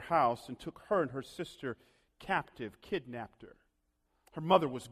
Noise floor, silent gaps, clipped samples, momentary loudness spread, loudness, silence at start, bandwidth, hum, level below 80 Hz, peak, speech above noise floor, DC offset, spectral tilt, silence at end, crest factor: -78 dBFS; none; under 0.1%; 18 LU; -35 LUFS; 0 s; 14.5 kHz; none; -66 dBFS; -10 dBFS; 44 dB; under 0.1%; -6 dB/octave; 0 s; 24 dB